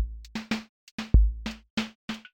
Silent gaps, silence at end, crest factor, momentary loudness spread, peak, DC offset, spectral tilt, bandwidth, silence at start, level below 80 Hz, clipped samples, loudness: 0.69-0.98 s, 1.70-1.77 s, 1.95-2.08 s; 0.15 s; 22 dB; 15 LU; -6 dBFS; under 0.1%; -6 dB/octave; 8.4 kHz; 0 s; -28 dBFS; under 0.1%; -30 LUFS